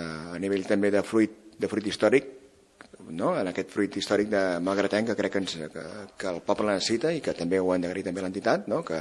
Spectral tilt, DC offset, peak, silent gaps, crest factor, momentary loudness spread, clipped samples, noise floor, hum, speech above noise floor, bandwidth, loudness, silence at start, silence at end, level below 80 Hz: -5 dB/octave; under 0.1%; -6 dBFS; none; 20 dB; 10 LU; under 0.1%; -54 dBFS; none; 27 dB; 12 kHz; -27 LUFS; 0 s; 0 s; -66 dBFS